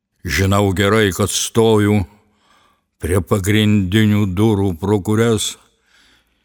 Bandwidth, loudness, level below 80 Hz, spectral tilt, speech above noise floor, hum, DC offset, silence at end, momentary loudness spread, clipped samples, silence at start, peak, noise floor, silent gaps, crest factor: 19 kHz; -16 LUFS; -40 dBFS; -5.5 dB/octave; 42 dB; none; under 0.1%; 0.9 s; 6 LU; under 0.1%; 0.25 s; 0 dBFS; -57 dBFS; none; 16 dB